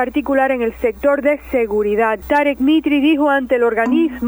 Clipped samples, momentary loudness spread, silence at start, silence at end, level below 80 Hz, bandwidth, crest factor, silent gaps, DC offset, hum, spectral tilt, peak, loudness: under 0.1%; 4 LU; 0 s; 0 s; -42 dBFS; over 20 kHz; 12 dB; none; under 0.1%; none; -6 dB/octave; -4 dBFS; -16 LUFS